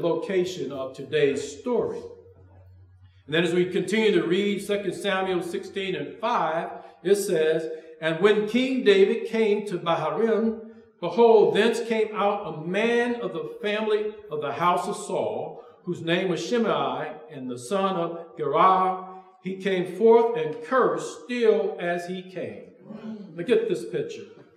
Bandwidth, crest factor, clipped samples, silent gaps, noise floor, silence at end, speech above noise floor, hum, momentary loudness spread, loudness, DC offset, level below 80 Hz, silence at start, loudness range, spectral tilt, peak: 13.5 kHz; 18 dB; under 0.1%; none; -53 dBFS; 0.25 s; 29 dB; none; 16 LU; -24 LUFS; under 0.1%; -72 dBFS; 0 s; 5 LU; -5.5 dB/octave; -6 dBFS